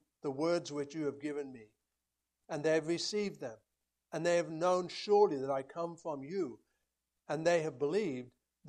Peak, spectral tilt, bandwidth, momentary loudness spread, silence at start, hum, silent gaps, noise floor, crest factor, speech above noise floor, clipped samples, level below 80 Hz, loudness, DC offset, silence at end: -16 dBFS; -5 dB/octave; 10 kHz; 12 LU; 0.25 s; none; none; -88 dBFS; 20 dB; 54 dB; under 0.1%; -80 dBFS; -35 LUFS; under 0.1%; 0 s